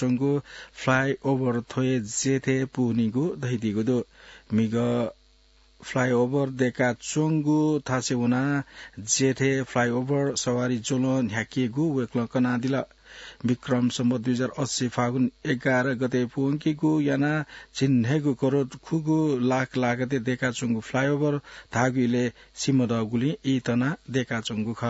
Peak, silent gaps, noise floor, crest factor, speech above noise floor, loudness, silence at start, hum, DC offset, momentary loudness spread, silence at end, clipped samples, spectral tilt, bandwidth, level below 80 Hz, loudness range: -6 dBFS; none; -58 dBFS; 18 dB; 34 dB; -25 LUFS; 0 s; none; under 0.1%; 6 LU; 0 s; under 0.1%; -5.5 dB/octave; 8 kHz; -60 dBFS; 2 LU